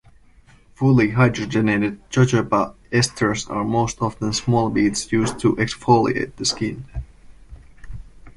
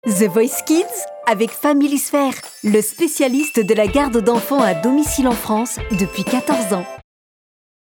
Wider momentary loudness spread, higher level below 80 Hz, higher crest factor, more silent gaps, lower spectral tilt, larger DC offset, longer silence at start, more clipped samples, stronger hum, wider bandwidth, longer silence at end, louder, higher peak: about the same, 7 LU vs 6 LU; about the same, -42 dBFS vs -40 dBFS; about the same, 18 dB vs 16 dB; neither; about the same, -5.5 dB/octave vs -4.5 dB/octave; neither; first, 0.8 s vs 0.05 s; neither; neither; second, 11.5 kHz vs over 20 kHz; second, 0.05 s vs 0.9 s; second, -20 LUFS vs -17 LUFS; about the same, -2 dBFS vs -2 dBFS